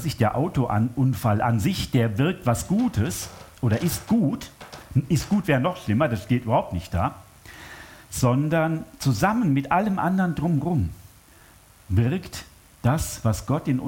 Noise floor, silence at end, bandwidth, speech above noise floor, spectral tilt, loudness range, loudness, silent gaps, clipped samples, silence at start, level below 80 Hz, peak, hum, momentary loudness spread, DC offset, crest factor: -52 dBFS; 0 s; 17 kHz; 29 dB; -6.5 dB/octave; 3 LU; -24 LUFS; none; under 0.1%; 0 s; -46 dBFS; -6 dBFS; none; 10 LU; under 0.1%; 16 dB